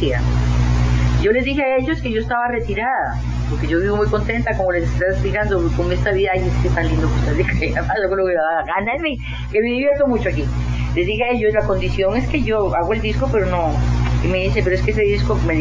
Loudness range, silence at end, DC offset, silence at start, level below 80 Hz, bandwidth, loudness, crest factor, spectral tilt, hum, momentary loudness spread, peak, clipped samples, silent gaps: 1 LU; 0 s; under 0.1%; 0 s; -24 dBFS; 7.6 kHz; -18 LUFS; 14 dB; -7 dB/octave; 60 Hz at -25 dBFS; 4 LU; -2 dBFS; under 0.1%; none